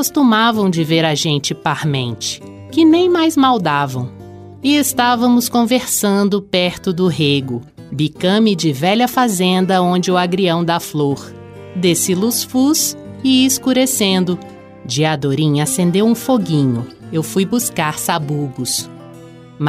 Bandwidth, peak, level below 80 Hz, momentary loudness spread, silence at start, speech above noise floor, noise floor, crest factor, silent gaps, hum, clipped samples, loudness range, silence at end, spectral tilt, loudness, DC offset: 16 kHz; -2 dBFS; -54 dBFS; 10 LU; 0 s; 22 dB; -37 dBFS; 14 dB; none; none; under 0.1%; 2 LU; 0 s; -4.5 dB/octave; -15 LUFS; under 0.1%